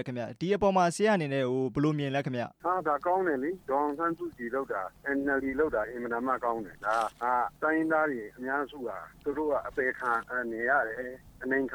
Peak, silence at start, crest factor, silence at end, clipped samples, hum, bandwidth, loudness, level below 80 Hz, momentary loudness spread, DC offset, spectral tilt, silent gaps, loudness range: -14 dBFS; 0 s; 16 dB; 0 s; under 0.1%; none; over 20 kHz; -30 LUFS; -60 dBFS; 9 LU; under 0.1%; -6 dB/octave; none; 3 LU